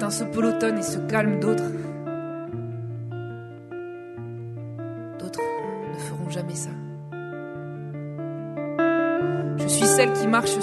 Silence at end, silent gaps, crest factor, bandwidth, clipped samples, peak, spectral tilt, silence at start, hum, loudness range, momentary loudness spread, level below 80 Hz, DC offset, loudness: 0 s; none; 20 dB; 12 kHz; under 0.1%; -6 dBFS; -4.5 dB/octave; 0 s; none; 10 LU; 16 LU; -64 dBFS; under 0.1%; -26 LUFS